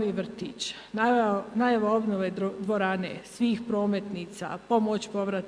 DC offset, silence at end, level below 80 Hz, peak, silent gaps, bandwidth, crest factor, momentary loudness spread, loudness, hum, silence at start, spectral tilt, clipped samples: under 0.1%; 0 s; -66 dBFS; -10 dBFS; none; 11 kHz; 16 dB; 11 LU; -28 LUFS; 50 Hz at -60 dBFS; 0 s; -5.5 dB/octave; under 0.1%